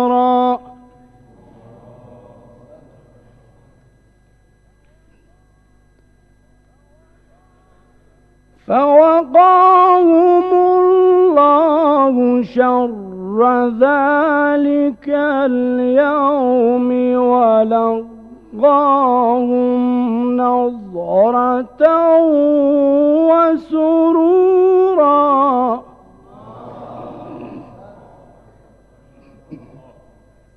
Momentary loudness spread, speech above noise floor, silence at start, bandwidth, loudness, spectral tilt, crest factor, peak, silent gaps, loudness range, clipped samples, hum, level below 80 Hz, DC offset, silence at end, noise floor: 12 LU; 40 dB; 0 s; 5.4 kHz; -13 LUFS; -8.5 dB/octave; 14 dB; 0 dBFS; none; 7 LU; under 0.1%; 50 Hz at -55 dBFS; -54 dBFS; under 0.1%; 1 s; -53 dBFS